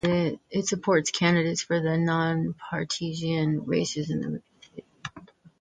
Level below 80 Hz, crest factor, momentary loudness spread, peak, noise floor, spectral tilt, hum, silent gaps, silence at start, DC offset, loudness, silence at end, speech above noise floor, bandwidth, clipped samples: -60 dBFS; 20 dB; 18 LU; -8 dBFS; -50 dBFS; -5 dB/octave; none; none; 0.05 s; under 0.1%; -26 LUFS; 0.35 s; 25 dB; 9.4 kHz; under 0.1%